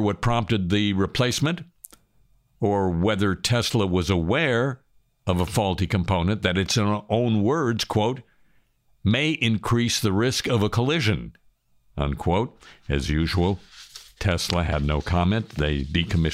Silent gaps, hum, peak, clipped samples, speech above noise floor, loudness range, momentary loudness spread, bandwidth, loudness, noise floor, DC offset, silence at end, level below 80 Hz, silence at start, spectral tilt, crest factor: none; none; -2 dBFS; under 0.1%; 39 dB; 2 LU; 8 LU; 16 kHz; -23 LUFS; -62 dBFS; under 0.1%; 0 s; -38 dBFS; 0 s; -5.5 dB/octave; 20 dB